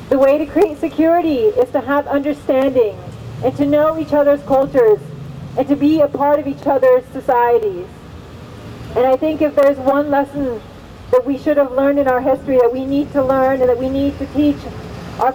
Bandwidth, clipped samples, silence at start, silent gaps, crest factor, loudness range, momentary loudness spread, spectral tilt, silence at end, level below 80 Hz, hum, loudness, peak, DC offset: 16 kHz; under 0.1%; 0 s; none; 14 dB; 2 LU; 16 LU; -7.5 dB/octave; 0 s; -42 dBFS; none; -15 LUFS; 0 dBFS; under 0.1%